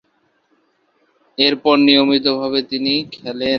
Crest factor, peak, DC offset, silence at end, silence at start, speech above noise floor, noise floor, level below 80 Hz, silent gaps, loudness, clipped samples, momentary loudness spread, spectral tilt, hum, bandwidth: 18 dB; 0 dBFS; under 0.1%; 0 s; 1.4 s; 47 dB; -63 dBFS; -58 dBFS; none; -15 LUFS; under 0.1%; 11 LU; -6 dB/octave; none; 6 kHz